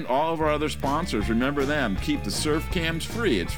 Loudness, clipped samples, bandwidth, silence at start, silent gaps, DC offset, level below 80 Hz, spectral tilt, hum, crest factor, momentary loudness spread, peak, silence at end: -25 LUFS; under 0.1%; over 20 kHz; 0 s; none; 1%; -36 dBFS; -5 dB/octave; none; 14 dB; 3 LU; -10 dBFS; 0 s